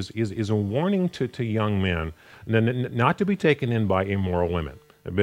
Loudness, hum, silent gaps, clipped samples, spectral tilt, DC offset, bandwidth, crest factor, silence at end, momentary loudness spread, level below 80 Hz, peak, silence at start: -24 LUFS; none; none; under 0.1%; -7.5 dB/octave; under 0.1%; 11.5 kHz; 20 dB; 0 s; 8 LU; -50 dBFS; -4 dBFS; 0 s